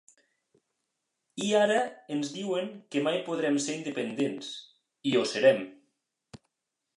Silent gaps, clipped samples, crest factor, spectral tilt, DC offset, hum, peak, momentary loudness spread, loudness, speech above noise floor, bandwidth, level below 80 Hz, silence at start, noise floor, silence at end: none; under 0.1%; 20 dB; -4 dB/octave; under 0.1%; none; -10 dBFS; 13 LU; -29 LUFS; 56 dB; 11.5 kHz; -80 dBFS; 1.35 s; -85 dBFS; 0.6 s